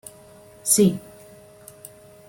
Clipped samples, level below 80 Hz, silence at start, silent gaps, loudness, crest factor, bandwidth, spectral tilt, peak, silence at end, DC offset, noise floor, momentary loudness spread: under 0.1%; -60 dBFS; 0.65 s; none; -19 LUFS; 20 dB; 16.5 kHz; -4.5 dB/octave; -6 dBFS; 1.3 s; under 0.1%; -48 dBFS; 26 LU